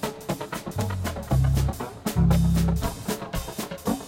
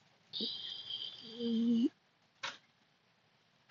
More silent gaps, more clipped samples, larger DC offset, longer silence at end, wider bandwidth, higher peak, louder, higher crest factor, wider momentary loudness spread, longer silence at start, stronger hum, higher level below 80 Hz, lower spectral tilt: neither; neither; neither; second, 0 s vs 1.15 s; first, 16.5 kHz vs 7.2 kHz; first, -10 dBFS vs -24 dBFS; first, -26 LUFS vs -38 LUFS; about the same, 16 dB vs 16 dB; about the same, 11 LU vs 12 LU; second, 0 s vs 0.35 s; neither; first, -32 dBFS vs under -90 dBFS; first, -6 dB/octave vs -3 dB/octave